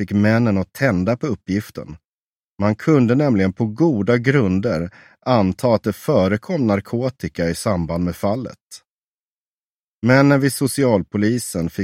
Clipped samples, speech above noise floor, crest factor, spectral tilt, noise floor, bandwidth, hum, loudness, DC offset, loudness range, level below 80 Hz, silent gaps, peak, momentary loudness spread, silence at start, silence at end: under 0.1%; over 72 dB; 18 dB; -6.5 dB/octave; under -90 dBFS; 16 kHz; none; -18 LUFS; under 0.1%; 4 LU; -48 dBFS; 2.07-2.57 s, 8.63-8.68 s, 8.87-9.14 s, 9.20-10.02 s; 0 dBFS; 9 LU; 0 s; 0 s